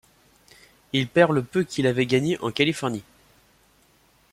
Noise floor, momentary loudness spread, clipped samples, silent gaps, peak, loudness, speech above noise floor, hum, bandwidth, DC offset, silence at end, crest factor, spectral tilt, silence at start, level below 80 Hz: -60 dBFS; 9 LU; under 0.1%; none; -4 dBFS; -23 LUFS; 38 dB; none; 15.5 kHz; under 0.1%; 1.3 s; 20 dB; -5.5 dB/octave; 0.95 s; -60 dBFS